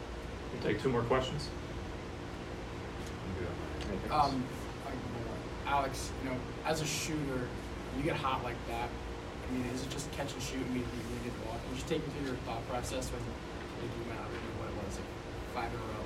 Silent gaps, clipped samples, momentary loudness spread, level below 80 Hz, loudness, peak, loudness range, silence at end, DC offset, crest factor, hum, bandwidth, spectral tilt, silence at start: none; under 0.1%; 10 LU; -48 dBFS; -38 LUFS; -16 dBFS; 3 LU; 0 s; under 0.1%; 22 dB; none; 16 kHz; -5 dB/octave; 0 s